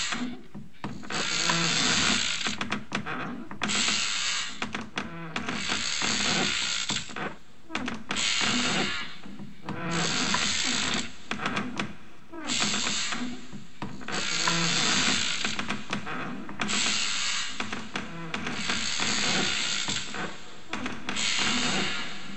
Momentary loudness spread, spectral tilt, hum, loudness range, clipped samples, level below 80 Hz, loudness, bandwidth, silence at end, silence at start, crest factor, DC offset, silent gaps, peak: 14 LU; -1.5 dB/octave; none; 3 LU; under 0.1%; -56 dBFS; -27 LUFS; 15.5 kHz; 0 s; 0 s; 20 dB; 2%; none; -10 dBFS